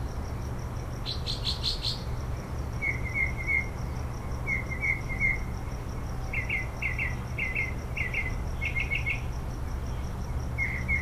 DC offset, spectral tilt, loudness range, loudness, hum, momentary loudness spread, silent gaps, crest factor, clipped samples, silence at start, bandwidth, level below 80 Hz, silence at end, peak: under 0.1%; -4.5 dB/octave; 2 LU; -31 LUFS; none; 8 LU; none; 16 dB; under 0.1%; 0 s; 15.5 kHz; -36 dBFS; 0 s; -14 dBFS